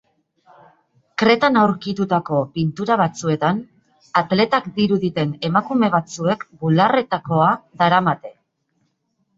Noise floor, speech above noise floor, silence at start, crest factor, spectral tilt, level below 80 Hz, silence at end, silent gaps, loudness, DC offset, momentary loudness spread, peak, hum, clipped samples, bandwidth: -69 dBFS; 51 dB; 1.2 s; 20 dB; -6.5 dB/octave; -60 dBFS; 1.05 s; none; -19 LUFS; under 0.1%; 7 LU; 0 dBFS; none; under 0.1%; 7.8 kHz